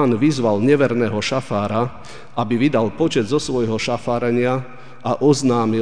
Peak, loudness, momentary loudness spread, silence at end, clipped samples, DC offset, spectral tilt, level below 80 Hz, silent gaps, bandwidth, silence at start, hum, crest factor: -2 dBFS; -19 LUFS; 10 LU; 0 s; under 0.1%; 2%; -6 dB/octave; -52 dBFS; none; 10 kHz; 0 s; none; 16 dB